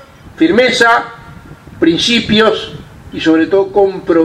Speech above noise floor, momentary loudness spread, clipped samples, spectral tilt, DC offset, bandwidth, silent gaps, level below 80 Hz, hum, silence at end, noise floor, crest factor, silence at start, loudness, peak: 24 dB; 16 LU; under 0.1%; -4.5 dB/octave; under 0.1%; 12 kHz; none; -42 dBFS; none; 0 s; -34 dBFS; 12 dB; 0.25 s; -11 LUFS; 0 dBFS